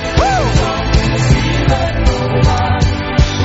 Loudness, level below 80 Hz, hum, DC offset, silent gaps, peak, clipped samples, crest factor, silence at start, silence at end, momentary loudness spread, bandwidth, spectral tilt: -14 LUFS; -18 dBFS; none; under 0.1%; none; 0 dBFS; under 0.1%; 12 dB; 0 s; 0 s; 2 LU; 8 kHz; -5.5 dB/octave